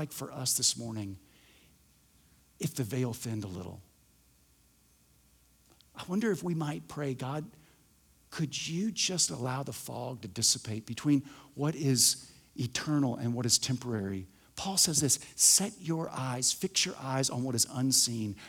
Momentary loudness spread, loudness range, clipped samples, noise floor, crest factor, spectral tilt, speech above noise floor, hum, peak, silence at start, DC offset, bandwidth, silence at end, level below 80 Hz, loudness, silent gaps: 15 LU; 12 LU; under 0.1%; -66 dBFS; 24 dB; -3 dB/octave; 34 dB; none; -10 dBFS; 0 s; under 0.1%; over 20 kHz; 0 s; -68 dBFS; -30 LUFS; none